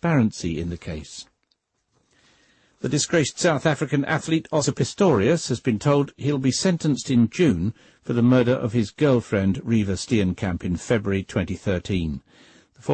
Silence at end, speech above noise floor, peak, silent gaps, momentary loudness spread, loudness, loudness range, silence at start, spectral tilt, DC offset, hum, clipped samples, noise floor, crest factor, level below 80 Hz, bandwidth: 0 s; 50 dB; -8 dBFS; none; 11 LU; -22 LUFS; 5 LU; 0 s; -5.5 dB/octave; under 0.1%; none; under 0.1%; -71 dBFS; 14 dB; -48 dBFS; 8.8 kHz